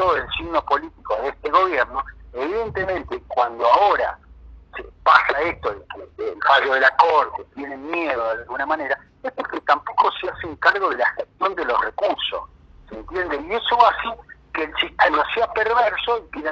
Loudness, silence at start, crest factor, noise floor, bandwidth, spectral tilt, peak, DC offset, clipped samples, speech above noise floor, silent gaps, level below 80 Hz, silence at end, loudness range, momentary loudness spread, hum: -20 LUFS; 0 s; 20 dB; -44 dBFS; 7.8 kHz; -4.5 dB/octave; 0 dBFS; under 0.1%; under 0.1%; 23 dB; none; -48 dBFS; 0 s; 4 LU; 15 LU; none